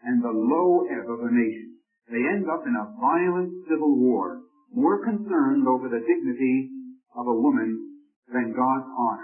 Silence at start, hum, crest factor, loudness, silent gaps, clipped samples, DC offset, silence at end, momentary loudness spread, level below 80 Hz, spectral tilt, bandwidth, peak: 0.05 s; none; 16 dB; -24 LUFS; 8.16-8.23 s; under 0.1%; under 0.1%; 0 s; 12 LU; -74 dBFS; -12.5 dB/octave; 3 kHz; -10 dBFS